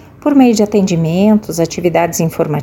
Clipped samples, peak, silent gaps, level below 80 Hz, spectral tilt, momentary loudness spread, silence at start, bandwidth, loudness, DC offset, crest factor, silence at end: under 0.1%; 0 dBFS; none; -46 dBFS; -6 dB/octave; 6 LU; 0.25 s; 17 kHz; -12 LUFS; under 0.1%; 12 dB; 0 s